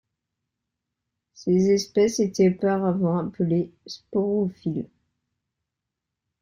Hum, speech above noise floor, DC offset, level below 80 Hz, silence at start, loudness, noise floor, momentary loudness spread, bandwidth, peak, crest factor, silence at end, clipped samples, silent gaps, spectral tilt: none; 62 dB; under 0.1%; -62 dBFS; 1.4 s; -24 LUFS; -84 dBFS; 13 LU; 11.5 kHz; -10 dBFS; 16 dB; 1.55 s; under 0.1%; none; -6.5 dB/octave